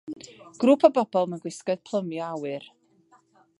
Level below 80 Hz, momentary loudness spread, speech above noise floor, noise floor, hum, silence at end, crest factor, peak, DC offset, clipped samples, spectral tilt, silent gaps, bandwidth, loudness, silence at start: -80 dBFS; 20 LU; 37 dB; -61 dBFS; none; 0.95 s; 24 dB; -2 dBFS; under 0.1%; under 0.1%; -6 dB/octave; none; 11.5 kHz; -25 LUFS; 0.05 s